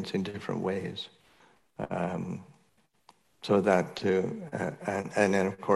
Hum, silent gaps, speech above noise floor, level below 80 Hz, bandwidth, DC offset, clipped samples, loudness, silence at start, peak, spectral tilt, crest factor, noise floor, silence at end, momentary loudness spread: none; none; 40 dB; -70 dBFS; 12 kHz; under 0.1%; under 0.1%; -30 LUFS; 0 s; -10 dBFS; -6 dB/octave; 20 dB; -69 dBFS; 0 s; 15 LU